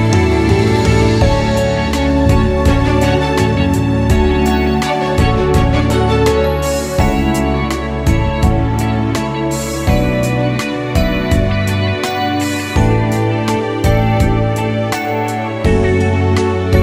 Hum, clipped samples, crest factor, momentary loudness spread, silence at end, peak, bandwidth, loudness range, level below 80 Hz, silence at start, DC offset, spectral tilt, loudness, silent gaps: none; under 0.1%; 12 dB; 5 LU; 0 s; 0 dBFS; 16 kHz; 3 LU; -22 dBFS; 0 s; under 0.1%; -6.5 dB/octave; -14 LUFS; none